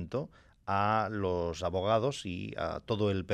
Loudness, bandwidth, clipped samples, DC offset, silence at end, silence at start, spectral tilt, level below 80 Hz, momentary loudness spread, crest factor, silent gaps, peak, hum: -32 LUFS; 10.5 kHz; under 0.1%; under 0.1%; 0 s; 0 s; -6 dB/octave; -60 dBFS; 9 LU; 18 dB; none; -14 dBFS; none